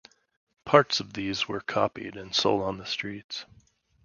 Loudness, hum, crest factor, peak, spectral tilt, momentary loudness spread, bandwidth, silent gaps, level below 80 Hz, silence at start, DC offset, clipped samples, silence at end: -27 LUFS; none; 26 dB; -2 dBFS; -4 dB/octave; 16 LU; 7.4 kHz; 3.24-3.29 s; -60 dBFS; 0.65 s; under 0.1%; under 0.1%; 0.6 s